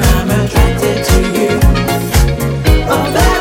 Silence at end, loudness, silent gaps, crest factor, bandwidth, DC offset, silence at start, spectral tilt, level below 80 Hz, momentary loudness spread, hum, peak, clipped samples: 0 s; -12 LUFS; none; 10 dB; 17 kHz; under 0.1%; 0 s; -5.5 dB/octave; -14 dBFS; 3 LU; none; 0 dBFS; under 0.1%